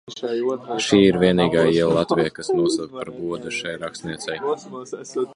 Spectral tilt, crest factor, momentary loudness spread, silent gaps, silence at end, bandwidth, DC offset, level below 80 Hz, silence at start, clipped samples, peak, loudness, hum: -5.5 dB/octave; 18 dB; 14 LU; none; 0 s; 11 kHz; under 0.1%; -52 dBFS; 0.1 s; under 0.1%; -2 dBFS; -21 LUFS; none